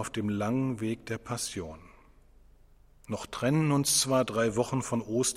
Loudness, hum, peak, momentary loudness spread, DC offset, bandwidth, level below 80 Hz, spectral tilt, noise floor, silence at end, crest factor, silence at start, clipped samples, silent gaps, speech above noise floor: -29 LUFS; none; -12 dBFS; 13 LU; under 0.1%; 16 kHz; -58 dBFS; -4.5 dB/octave; -58 dBFS; 0 s; 18 dB; 0 s; under 0.1%; none; 29 dB